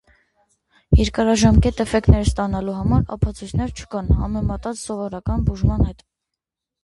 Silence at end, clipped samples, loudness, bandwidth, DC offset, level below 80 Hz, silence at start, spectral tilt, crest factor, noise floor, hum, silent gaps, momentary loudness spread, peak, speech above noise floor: 0.9 s; under 0.1%; -20 LUFS; 11.5 kHz; under 0.1%; -26 dBFS; 0.9 s; -6.5 dB/octave; 20 dB; -84 dBFS; none; none; 11 LU; 0 dBFS; 65 dB